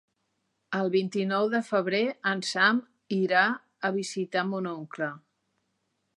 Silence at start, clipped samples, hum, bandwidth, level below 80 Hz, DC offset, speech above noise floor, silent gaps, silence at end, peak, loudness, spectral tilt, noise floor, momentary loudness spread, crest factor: 0.7 s; under 0.1%; none; 11.5 kHz; -82 dBFS; under 0.1%; 50 dB; none; 1 s; -8 dBFS; -28 LUFS; -5 dB/octave; -77 dBFS; 10 LU; 20 dB